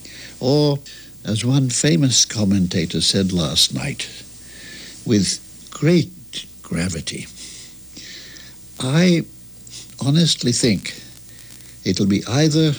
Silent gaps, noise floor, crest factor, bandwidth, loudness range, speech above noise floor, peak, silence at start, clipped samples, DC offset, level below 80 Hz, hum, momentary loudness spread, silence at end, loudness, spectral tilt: none; -40 dBFS; 16 dB; over 20 kHz; 6 LU; 22 dB; -4 dBFS; 0 s; under 0.1%; under 0.1%; -48 dBFS; none; 20 LU; 0 s; -18 LUFS; -4.5 dB/octave